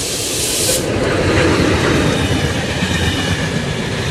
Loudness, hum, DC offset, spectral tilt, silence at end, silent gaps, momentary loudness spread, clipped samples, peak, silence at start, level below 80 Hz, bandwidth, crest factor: -15 LUFS; none; under 0.1%; -4 dB/octave; 0 s; none; 5 LU; under 0.1%; -2 dBFS; 0 s; -30 dBFS; 16 kHz; 14 dB